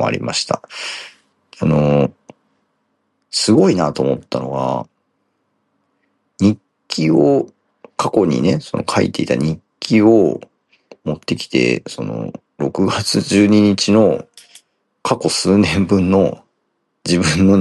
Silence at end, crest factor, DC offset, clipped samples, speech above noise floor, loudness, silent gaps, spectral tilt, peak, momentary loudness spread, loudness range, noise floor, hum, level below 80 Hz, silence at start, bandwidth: 0 s; 16 dB; under 0.1%; under 0.1%; 54 dB; -16 LUFS; none; -5.5 dB/octave; -2 dBFS; 14 LU; 5 LU; -69 dBFS; none; -50 dBFS; 0 s; 12 kHz